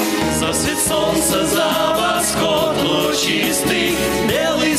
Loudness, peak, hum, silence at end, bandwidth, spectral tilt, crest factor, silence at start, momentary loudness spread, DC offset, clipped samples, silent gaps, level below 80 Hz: -16 LUFS; -6 dBFS; none; 0 s; 16 kHz; -3 dB/octave; 10 dB; 0 s; 1 LU; under 0.1%; under 0.1%; none; -40 dBFS